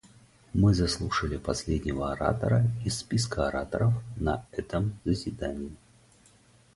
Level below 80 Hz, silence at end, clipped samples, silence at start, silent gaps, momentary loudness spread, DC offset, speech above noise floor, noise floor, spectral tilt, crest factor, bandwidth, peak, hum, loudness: -42 dBFS; 1 s; under 0.1%; 0.55 s; none; 9 LU; under 0.1%; 32 dB; -59 dBFS; -6 dB/octave; 20 dB; 11.5 kHz; -8 dBFS; none; -29 LUFS